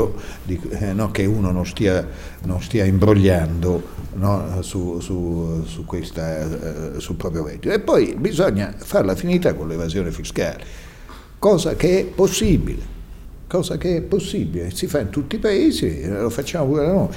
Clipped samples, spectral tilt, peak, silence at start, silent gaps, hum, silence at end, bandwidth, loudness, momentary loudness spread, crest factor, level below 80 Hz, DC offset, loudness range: under 0.1%; -6.5 dB/octave; -2 dBFS; 0 s; none; none; 0 s; 16.5 kHz; -21 LUFS; 11 LU; 18 dB; -34 dBFS; under 0.1%; 5 LU